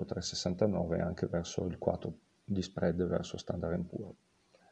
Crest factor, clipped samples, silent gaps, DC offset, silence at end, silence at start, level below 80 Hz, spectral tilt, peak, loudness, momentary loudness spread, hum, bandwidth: 22 dB; under 0.1%; none; under 0.1%; 0.55 s; 0 s; -56 dBFS; -6 dB/octave; -14 dBFS; -35 LUFS; 10 LU; none; 8.8 kHz